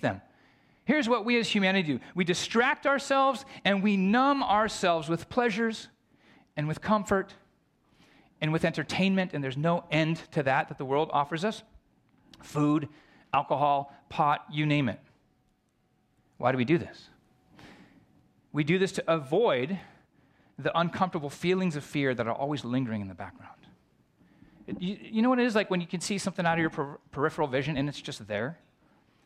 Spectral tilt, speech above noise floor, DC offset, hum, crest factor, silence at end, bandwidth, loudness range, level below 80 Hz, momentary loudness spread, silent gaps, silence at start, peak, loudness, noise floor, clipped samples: -5.5 dB/octave; 43 dB; under 0.1%; none; 20 dB; 0.7 s; 13.5 kHz; 6 LU; -64 dBFS; 11 LU; none; 0 s; -10 dBFS; -28 LUFS; -71 dBFS; under 0.1%